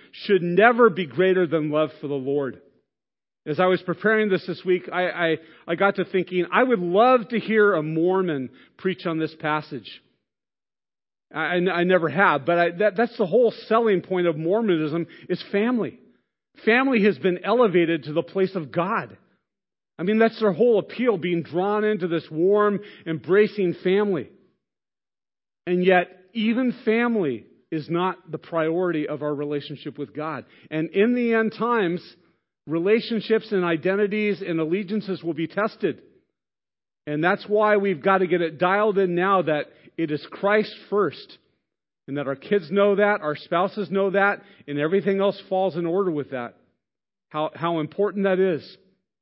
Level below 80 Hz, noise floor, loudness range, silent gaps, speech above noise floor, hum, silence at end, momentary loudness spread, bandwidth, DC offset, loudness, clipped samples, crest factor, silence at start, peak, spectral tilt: -76 dBFS; under -90 dBFS; 5 LU; none; over 68 dB; none; 0.5 s; 11 LU; 5.8 kHz; under 0.1%; -23 LUFS; under 0.1%; 22 dB; 0.15 s; -2 dBFS; -11 dB/octave